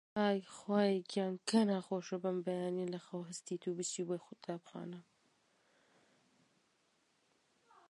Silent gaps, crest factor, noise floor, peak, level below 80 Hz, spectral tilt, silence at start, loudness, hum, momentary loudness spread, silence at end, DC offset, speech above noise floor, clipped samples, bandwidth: none; 20 dB; -77 dBFS; -18 dBFS; -86 dBFS; -5 dB/octave; 0.15 s; -38 LUFS; none; 13 LU; 2.9 s; under 0.1%; 39 dB; under 0.1%; 11.5 kHz